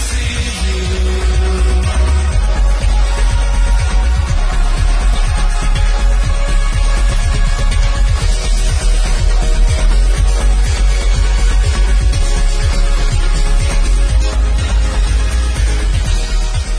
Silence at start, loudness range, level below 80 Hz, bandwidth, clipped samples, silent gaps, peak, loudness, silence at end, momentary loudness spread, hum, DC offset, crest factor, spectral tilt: 0 s; 1 LU; -12 dBFS; 11 kHz; under 0.1%; none; -2 dBFS; -16 LUFS; 0 s; 3 LU; none; under 0.1%; 10 dB; -4.5 dB/octave